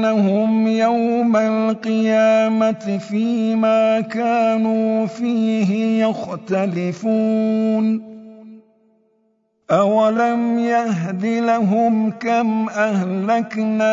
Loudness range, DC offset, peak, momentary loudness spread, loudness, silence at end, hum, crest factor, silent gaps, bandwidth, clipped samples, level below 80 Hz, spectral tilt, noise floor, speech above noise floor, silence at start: 3 LU; under 0.1%; -4 dBFS; 5 LU; -18 LUFS; 0 s; none; 14 dB; none; 7.6 kHz; under 0.1%; -70 dBFS; -7 dB/octave; -64 dBFS; 47 dB; 0 s